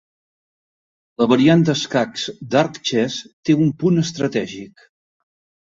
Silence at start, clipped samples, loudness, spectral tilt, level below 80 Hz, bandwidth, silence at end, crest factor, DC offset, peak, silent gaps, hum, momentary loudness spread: 1.2 s; under 0.1%; -18 LUFS; -6 dB/octave; -60 dBFS; 7.8 kHz; 1.1 s; 18 dB; under 0.1%; -2 dBFS; 3.33-3.43 s; none; 11 LU